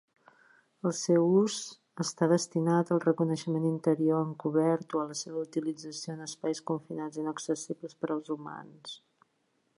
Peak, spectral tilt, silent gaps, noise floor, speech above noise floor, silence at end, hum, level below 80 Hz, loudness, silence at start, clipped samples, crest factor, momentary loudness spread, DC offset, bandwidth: -14 dBFS; -6 dB/octave; none; -75 dBFS; 45 dB; 0.8 s; none; -82 dBFS; -31 LUFS; 0.85 s; under 0.1%; 18 dB; 12 LU; under 0.1%; 11.5 kHz